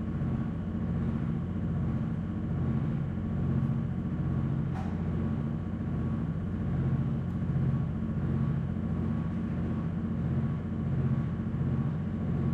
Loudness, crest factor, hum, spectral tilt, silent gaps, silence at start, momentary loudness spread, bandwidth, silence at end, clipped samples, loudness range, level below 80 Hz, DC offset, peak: -32 LUFS; 12 dB; 60 Hz at -45 dBFS; -10.5 dB/octave; none; 0 s; 3 LU; 4.5 kHz; 0 s; under 0.1%; 1 LU; -44 dBFS; under 0.1%; -18 dBFS